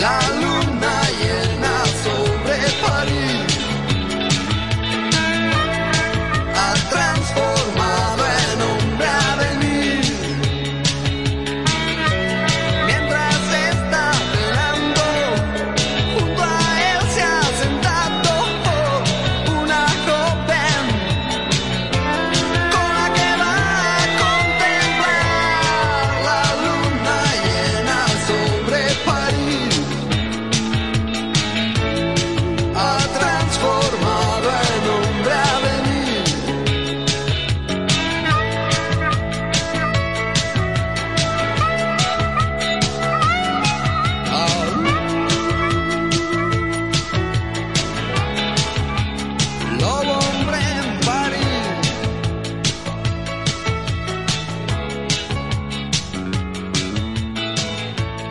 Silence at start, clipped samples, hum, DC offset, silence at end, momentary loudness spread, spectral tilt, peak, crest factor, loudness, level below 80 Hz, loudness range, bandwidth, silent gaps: 0 s; under 0.1%; none; 0.9%; 0 s; 5 LU; -4 dB/octave; -4 dBFS; 16 dB; -18 LUFS; -34 dBFS; 4 LU; 11.5 kHz; none